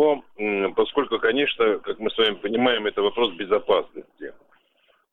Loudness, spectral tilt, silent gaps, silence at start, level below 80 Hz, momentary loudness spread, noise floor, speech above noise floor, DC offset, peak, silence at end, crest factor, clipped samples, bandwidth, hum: -23 LUFS; -6 dB/octave; none; 0 s; -58 dBFS; 15 LU; -64 dBFS; 42 dB; under 0.1%; -6 dBFS; 0.8 s; 16 dB; under 0.1%; 4.2 kHz; none